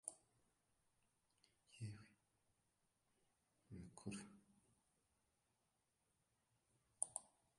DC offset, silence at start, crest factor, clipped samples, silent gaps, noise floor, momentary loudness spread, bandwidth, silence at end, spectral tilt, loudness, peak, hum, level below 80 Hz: under 0.1%; 0.05 s; 38 dB; under 0.1%; none; -87 dBFS; 16 LU; 11.5 kHz; 0.3 s; -3.5 dB/octave; -53 LUFS; -24 dBFS; none; -82 dBFS